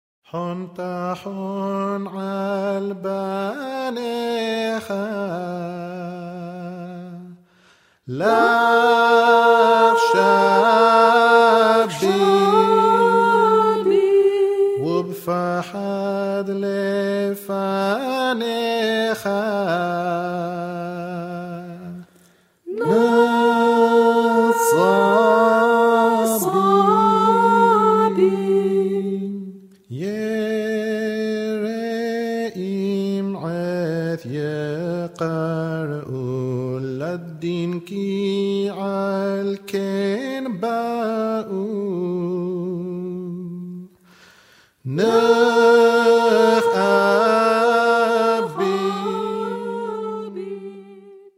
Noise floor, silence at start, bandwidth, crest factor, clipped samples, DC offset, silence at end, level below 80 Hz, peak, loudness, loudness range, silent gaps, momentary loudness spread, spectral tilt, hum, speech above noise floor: -56 dBFS; 0.35 s; 16 kHz; 18 dB; under 0.1%; under 0.1%; 0.2 s; -68 dBFS; 0 dBFS; -19 LUFS; 11 LU; none; 15 LU; -5.5 dB/octave; none; 35 dB